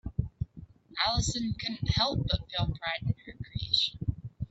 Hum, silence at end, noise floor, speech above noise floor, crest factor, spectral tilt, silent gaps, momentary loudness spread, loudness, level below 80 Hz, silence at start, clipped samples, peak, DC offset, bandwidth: none; 0.05 s; -51 dBFS; 20 dB; 20 dB; -4 dB/octave; none; 14 LU; -31 LUFS; -42 dBFS; 0.05 s; under 0.1%; -12 dBFS; under 0.1%; 8.2 kHz